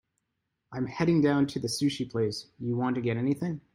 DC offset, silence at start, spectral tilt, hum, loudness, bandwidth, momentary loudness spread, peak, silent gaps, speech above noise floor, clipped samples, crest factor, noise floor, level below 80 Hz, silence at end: under 0.1%; 0.7 s; -6 dB/octave; none; -29 LUFS; 15.5 kHz; 11 LU; -14 dBFS; none; 53 dB; under 0.1%; 16 dB; -81 dBFS; -64 dBFS; 0.15 s